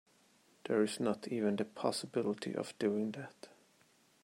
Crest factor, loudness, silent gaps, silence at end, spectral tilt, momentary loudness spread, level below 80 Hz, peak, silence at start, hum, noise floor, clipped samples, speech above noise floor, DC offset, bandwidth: 20 dB; -37 LUFS; none; 0.75 s; -5 dB/octave; 17 LU; -84 dBFS; -18 dBFS; 0.65 s; none; -69 dBFS; under 0.1%; 33 dB; under 0.1%; 16 kHz